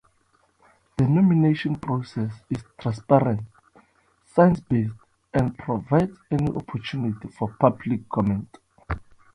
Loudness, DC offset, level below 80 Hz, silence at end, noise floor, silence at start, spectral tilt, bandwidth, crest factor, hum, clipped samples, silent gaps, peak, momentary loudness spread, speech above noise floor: -24 LUFS; under 0.1%; -48 dBFS; 0.35 s; -65 dBFS; 1 s; -9 dB/octave; 10.5 kHz; 22 dB; none; under 0.1%; none; -2 dBFS; 14 LU; 42 dB